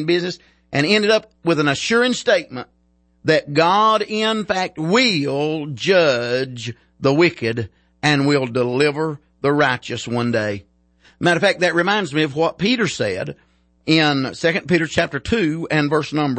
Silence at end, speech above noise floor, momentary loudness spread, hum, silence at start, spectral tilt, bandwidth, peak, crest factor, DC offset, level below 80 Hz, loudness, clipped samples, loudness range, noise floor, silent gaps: 0 s; 37 dB; 10 LU; none; 0 s; -5 dB/octave; 8.8 kHz; -2 dBFS; 16 dB; under 0.1%; -52 dBFS; -18 LUFS; under 0.1%; 2 LU; -55 dBFS; none